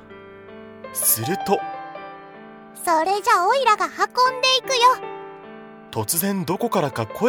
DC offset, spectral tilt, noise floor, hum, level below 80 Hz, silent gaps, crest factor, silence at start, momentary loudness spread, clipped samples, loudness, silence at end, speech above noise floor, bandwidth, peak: under 0.1%; -2.5 dB/octave; -42 dBFS; none; -64 dBFS; none; 18 dB; 0 s; 23 LU; under 0.1%; -20 LUFS; 0 s; 22 dB; over 20 kHz; -4 dBFS